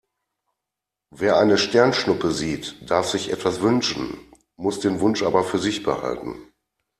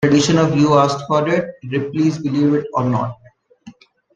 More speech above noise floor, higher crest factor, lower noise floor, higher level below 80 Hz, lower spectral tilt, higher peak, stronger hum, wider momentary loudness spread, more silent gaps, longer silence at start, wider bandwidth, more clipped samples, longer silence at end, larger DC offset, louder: first, 64 dB vs 28 dB; about the same, 20 dB vs 16 dB; first, -85 dBFS vs -44 dBFS; about the same, -54 dBFS vs -54 dBFS; second, -4.5 dB/octave vs -6 dB/octave; about the same, -2 dBFS vs -2 dBFS; neither; first, 13 LU vs 9 LU; neither; first, 1.15 s vs 0 s; first, 14 kHz vs 9.2 kHz; neither; about the same, 0.55 s vs 0.45 s; neither; second, -21 LUFS vs -17 LUFS